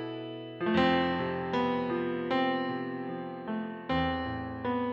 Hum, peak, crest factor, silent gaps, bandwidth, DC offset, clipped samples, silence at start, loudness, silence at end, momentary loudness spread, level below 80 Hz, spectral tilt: none; -14 dBFS; 16 dB; none; 6.8 kHz; under 0.1%; under 0.1%; 0 s; -31 LUFS; 0 s; 11 LU; -56 dBFS; -7.5 dB/octave